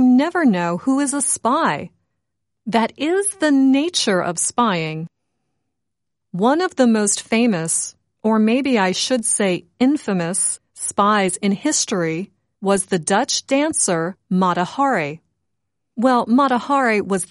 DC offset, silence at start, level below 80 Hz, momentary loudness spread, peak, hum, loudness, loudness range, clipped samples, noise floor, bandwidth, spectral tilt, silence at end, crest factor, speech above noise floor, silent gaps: under 0.1%; 0 s; -64 dBFS; 8 LU; -2 dBFS; none; -18 LUFS; 2 LU; under 0.1%; -81 dBFS; 11.5 kHz; -3.5 dB/octave; 0.05 s; 16 dB; 63 dB; none